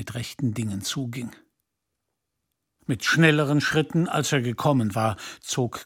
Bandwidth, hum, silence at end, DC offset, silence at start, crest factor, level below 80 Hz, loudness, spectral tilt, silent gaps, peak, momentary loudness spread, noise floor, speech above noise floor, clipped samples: 17 kHz; none; 0 s; under 0.1%; 0 s; 20 dB; -60 dBFS; -24 LUFS; -5 dB/octave; none; -4 dBFS; 14 LU; -81 dBFS; 57 dB; under 0.1%